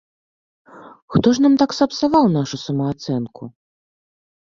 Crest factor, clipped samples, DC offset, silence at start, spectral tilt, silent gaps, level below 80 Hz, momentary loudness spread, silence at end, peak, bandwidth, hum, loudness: 18 dB; under 0.1%; under 0.1%; 0.75 s; -6.5 dB/octave; 1.02-1.08 s; -52 dBFS; 13 LU; 1.1 s; -2 dBFS; 7.4 kHz; none; -18 LUFS